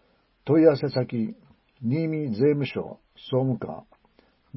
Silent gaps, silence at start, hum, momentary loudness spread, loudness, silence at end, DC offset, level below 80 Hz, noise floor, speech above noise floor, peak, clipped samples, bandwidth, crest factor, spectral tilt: none; 0.45 s; none; 19 LU; -25 LUFS; 0.75 s; under 0.1%; -64 dBFS; -62 dBFS; 38 dB; -6 dBFS; under 0.1%; 5.8 kHz; 20 dB; -12 dB/octave